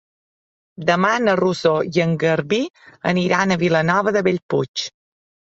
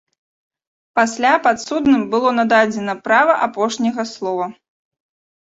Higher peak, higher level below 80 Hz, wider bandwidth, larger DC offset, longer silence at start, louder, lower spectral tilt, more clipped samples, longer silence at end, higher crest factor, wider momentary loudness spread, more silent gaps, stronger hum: about the same, -2 dBFS vs -2 dBFS; about the same, -58 dBFS vs -58 dBFS; about the same, 8 kHz vs 8 kHz; neither; second, 0.8 s vs 0.95 s; about the same, -19 LUFS vs -17 LUFS; first, -5.5 dB/octave vs -4 dB/octave; neither; second, 0.7 s vs 0.9 s; about the same, 18 dB vs 16 dB; about the same, 8 LU vs 9 LU; first, 2.70-2.74 s, 4.43-4.49 s, 4.68-4.74 s vs none; neither